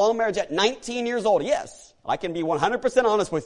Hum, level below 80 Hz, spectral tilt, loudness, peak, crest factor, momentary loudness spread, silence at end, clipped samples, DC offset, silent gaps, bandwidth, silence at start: none; -56 dBFS; -4 dB/octave; -24 LUFS; -6 dBFS; 16 dB; 8 LU; 0 s; under 0.1%; under 0.1%; none; 11 kHz; 0 s